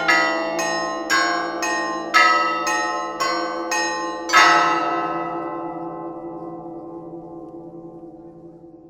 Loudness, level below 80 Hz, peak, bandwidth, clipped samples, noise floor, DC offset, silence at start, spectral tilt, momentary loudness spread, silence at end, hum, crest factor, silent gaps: -19 LUFS; -60 dBFS; 0 dBFS; 17 kHz; under 0.1%; -42 dBFS; under 0.1%; 0 s; -2 dB/octave; 23 LU; 0 s; none; 22 dB; none